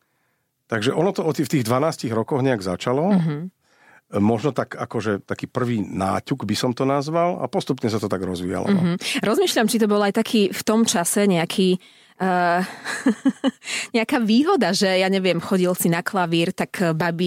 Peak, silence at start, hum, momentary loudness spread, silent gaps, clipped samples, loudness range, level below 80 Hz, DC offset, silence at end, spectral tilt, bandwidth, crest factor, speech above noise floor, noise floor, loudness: -8 dBFS; 0.7 s; none; 7 LU; none; under 0.1%; 4 LU; -64 dBFS; under 0.1%; 0 s; -5 dB/octave; 16.5 kHz; 14 dB; 49 dB; -70 dBFS; -21 LUFS